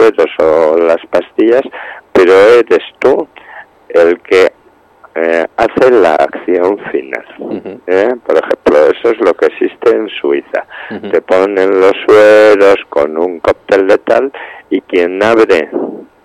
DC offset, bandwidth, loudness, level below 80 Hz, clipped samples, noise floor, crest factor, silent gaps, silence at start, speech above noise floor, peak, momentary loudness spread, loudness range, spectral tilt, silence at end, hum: under 0.1%; 11 kHz; -10 LUFS; -48 dBFS; under 0.1%; -45 dBFS; 10 dB; none; 0 s; 36 dB; 0 dBFS; 14 LU; 4 LU; -5 dB/octave; 0.2 s; none